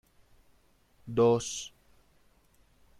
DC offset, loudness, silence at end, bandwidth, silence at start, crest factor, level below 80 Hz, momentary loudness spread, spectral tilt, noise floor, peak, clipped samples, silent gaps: under 0.1%; -29 LUFS; 1.3 s; 12.5 kHz; 1.05 s; 20 dB; -64 dBFS; 21 LU; -5 dB/octave; -66 dBFS; -14 dBFS; under 0.1%; none